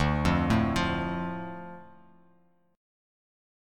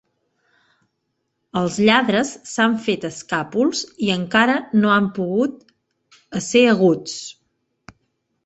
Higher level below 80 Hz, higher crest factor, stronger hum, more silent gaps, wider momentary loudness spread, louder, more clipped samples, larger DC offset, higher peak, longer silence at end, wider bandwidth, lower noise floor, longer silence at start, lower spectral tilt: first, -42 dBFS vs -62 dBFS; about the same, 20 dB vs 20 dB; neither; neither; first, 19 LU vs 12 LU; second, -28 LUFS vs -19 LUFS; neither; neither; second, -10 dBFS vs -2 dBFS; second, 0.95 s vs 1.15 s; first, 14 kHz vs 8.2 kHz; second, -66 dBFS vs -74 dBFS; second, 0 s vs 1.55 s; first, -6.5 dB/octave vs -4.5 dB/octave